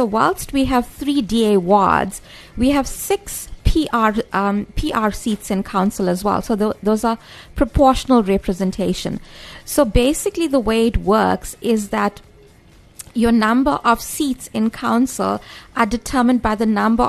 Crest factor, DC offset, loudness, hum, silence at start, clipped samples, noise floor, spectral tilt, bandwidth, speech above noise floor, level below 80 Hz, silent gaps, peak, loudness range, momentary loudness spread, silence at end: 16 dB; under 0.1%; -18 LUFS; none; 0 s; under 0.1%; -47 dBFS; -5 dB/octave; 13.5 kHz; 30 dB; -32 dBFS; none; -2 dBFS; 2 LU; 8 LU; 0 s